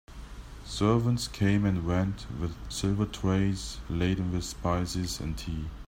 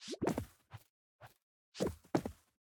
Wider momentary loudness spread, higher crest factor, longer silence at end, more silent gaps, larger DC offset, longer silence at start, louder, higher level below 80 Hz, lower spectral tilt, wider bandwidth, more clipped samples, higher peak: second, 10 LU vs 23 LU; second, 16 dB vs 24 dB; second, 0 s vs 0.3 s; second, none vs 0.90-1.19 s, 1.42-1.72 s; neither; about the same, 0.1 s vs 0 s; first, -30 LUFS vs -40 LUFS; first, -42 dBFS vs -62 dBFS; about the same, -6 dB/octave vs -5.5 dB/octave; second, 16 kHz vs 19.5 kHz; neither; first, -12 dBFS vs -18 dBFS